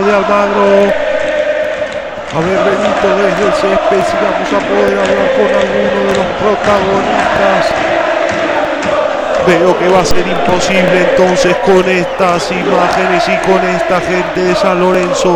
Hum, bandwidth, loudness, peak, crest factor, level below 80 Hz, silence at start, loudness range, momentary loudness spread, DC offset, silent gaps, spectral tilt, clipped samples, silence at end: none; over 20 kHz; -11 LUFS; 0 dBFS; 10 dB; -36 dBFS; 0 s; 2 LU; 4 LU; under 0.1%; none; -5 dB/octave; under 0.1%; 0 s